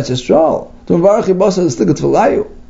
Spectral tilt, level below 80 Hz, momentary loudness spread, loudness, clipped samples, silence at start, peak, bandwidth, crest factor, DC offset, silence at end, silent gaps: -6.5 dB/octave; -38 dBFS; 4 LU; -12 LUFS; under 0.1%; 0 s; 0 dBFS; 8 kHz; 12 dB; under 0.1%; 0.05 s; none